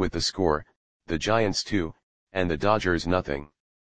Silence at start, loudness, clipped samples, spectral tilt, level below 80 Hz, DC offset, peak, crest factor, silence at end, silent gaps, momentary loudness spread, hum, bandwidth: 0 s; -26 LUFS; under 0.1%; -4.5 dB/octave; -44 dBFS; 0.7%; -8 dBFS; 20 dB; 0.25 s; 0.76-1.00 s, 2.03-2.27 s; 10 LU; none; 10 kHz